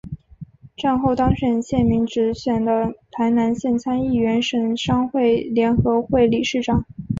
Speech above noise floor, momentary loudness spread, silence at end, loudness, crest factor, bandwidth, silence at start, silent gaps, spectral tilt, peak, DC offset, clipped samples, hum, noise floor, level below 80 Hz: 22 dB; 5 LU; 0 s; -20 LUFS; 16 dB; 7.6 kHz; 0.05 s; none; -6.5 dB/octave; -4 dBFS; under 0.1%; under 0.1%; none; -41 dBFS; -40 dBFS